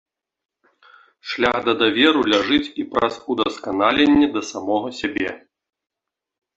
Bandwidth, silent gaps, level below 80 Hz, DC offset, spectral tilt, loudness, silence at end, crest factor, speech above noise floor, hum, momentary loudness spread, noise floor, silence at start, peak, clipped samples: 8 kHz; none; -52 dBFS; under 0.1%; -4 dB/octave; -19 LUFS; 1.2 s; 20 dB; 33 dB; none; 11 LU; -53 dBFS; 1.25 s; -2 dBFS; under 0.1%